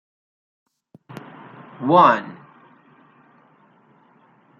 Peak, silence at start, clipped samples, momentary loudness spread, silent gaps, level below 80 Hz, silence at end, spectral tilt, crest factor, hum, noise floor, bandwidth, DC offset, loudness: -2 dBFS; 1.8 s; under 0.1%; 28 LU; none; -74 dBFS; 2.25 s; -7.5 dB/octave; 22 dB; none; -56 dBFS; 7.2 kHz; under 0.1%; -16 LUFS